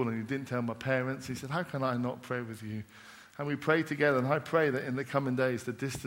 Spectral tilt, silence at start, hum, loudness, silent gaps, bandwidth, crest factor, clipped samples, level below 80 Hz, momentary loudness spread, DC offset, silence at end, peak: -6.5 dB/octave; 0 s; none; -32 LUFS; none; 16 kHz; 20 dB; under 0.1%; -66 dBFS; 12 LU; under 0.1%; 0 s; -12 dBFS